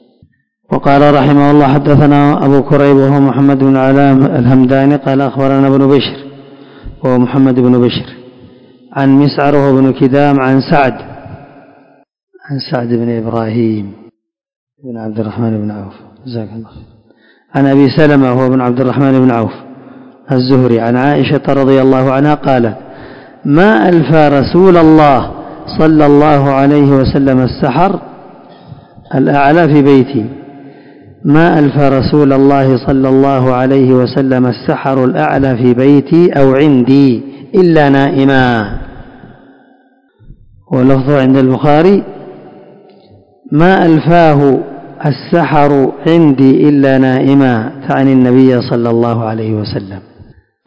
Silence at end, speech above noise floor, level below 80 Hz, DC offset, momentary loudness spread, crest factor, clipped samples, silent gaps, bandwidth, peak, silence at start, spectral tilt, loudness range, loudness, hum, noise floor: 0.45 s; 42 dB; -38 dBFS; under 0.1%; 12 LU; 10 dB; 3%; 12.23-12.27 s, 14.56-14.67 s; 6.2 kHz; 0 dBFS; 0.7 s; -9.5 dB/octave; 7 LU; -9 LUFS; none; -50 dBFS